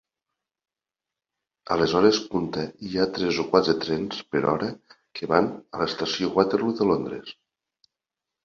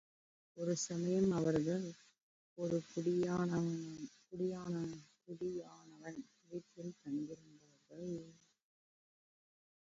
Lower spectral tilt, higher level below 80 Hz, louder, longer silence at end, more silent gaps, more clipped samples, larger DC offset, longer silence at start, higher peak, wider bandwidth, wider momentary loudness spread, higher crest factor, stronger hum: second, -5.5 dB/octave vs -7.5 dB/octave; first, -58 dBFS vs -74 dBFS; first, -24 LUFS vs -40 LUFS; second, 1.15 s vs 1.5 s; second, none vs 2.23-2.56 s; neither; neither; first, 1.7 s vs 0.55 s; first, -2 dBFS vs -24 dBFS; about the same, 7.2 kHz vs 7.6 kHz; second, 12 LU vs 19 LU; first, 24 dB vs 18 dB; neither